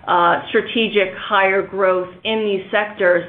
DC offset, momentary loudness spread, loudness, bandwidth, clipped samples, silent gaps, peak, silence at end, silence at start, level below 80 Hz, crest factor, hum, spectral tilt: under 0.1%; 5 LU; -18 LUFS; 4.3 kHz; under 0.1%; none; -2 dBFS; 0 s; 0 s; -58 dBFS; 16 dB; none; -8.5 dB/octave